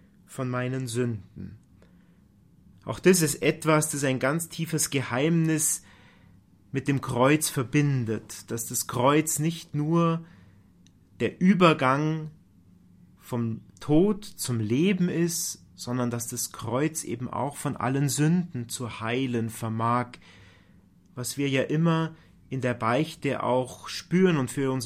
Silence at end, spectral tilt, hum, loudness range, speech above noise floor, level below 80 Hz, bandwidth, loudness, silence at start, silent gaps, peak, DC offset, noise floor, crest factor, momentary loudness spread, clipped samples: 0 s; -5 dB/octave; none; 4 LU; 32 dB; -58 dBFS; 16 kHz; -26 LUFS; 0.3 s; none; -4 dBFS; under 0.1%; -58 dBFS; 22 dB; 12 LU; under 0.1%